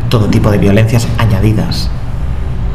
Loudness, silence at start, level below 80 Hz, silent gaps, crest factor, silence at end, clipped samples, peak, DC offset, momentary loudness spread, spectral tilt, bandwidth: -12 LUFS; 0 s; -18 dBFS; none; 12 dB; 0 s; 0.2%; 0 dBFS; 9%; 10 LU; -7 dB/octave; 14 kHz